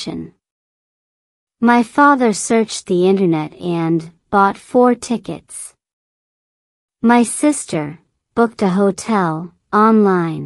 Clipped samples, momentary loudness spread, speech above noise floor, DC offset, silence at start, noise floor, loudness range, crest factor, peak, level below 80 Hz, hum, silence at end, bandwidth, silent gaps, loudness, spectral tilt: under 0.1%; 15 LU; over 75 dB; under 0.1%; 0 s; under -90 dBFS; 4 LU; 16 dB; 0 dBFS; -58 dBFS; none; 0 s; 12 kHz; 0.51-1.47 s, 5.93-6.89 s; -15 LUFS; -5.5 dB/octave